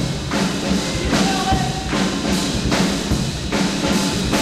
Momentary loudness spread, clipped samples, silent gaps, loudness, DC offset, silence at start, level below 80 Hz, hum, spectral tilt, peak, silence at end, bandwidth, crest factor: 3 LU; under 0.1%; none; -19 LUFS; under 0.1%; 0 s; -32 dBFS; none; -4.5 dB/octave; -4 dBFS; 0 s; 15.5 kHz; 14 dB